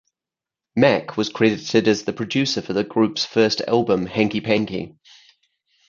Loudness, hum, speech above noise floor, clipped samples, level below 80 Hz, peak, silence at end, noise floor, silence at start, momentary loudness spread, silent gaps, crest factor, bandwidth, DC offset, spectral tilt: -20 LUFS; none; 69 dB; under 0.1%; -58 dBFS; -2 dBFS; 1 s; -89 dBFS; 0.75 s; 7 LU; none; 20 dB; 7.4 kHz; under 0.1%; -5 dB/octave